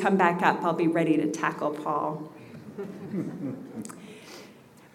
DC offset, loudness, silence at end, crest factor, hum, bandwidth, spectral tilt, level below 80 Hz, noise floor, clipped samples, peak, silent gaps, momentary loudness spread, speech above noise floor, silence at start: under 0.1%; -27 LUFS; 0.35 s; 22 dB; none; 14.5 kHz; -6.5 dB/octave; -76 dBFS; -52 dBFS; under 0.1%; -6 dBFS; none; 21 LU; 25 dB; 0 s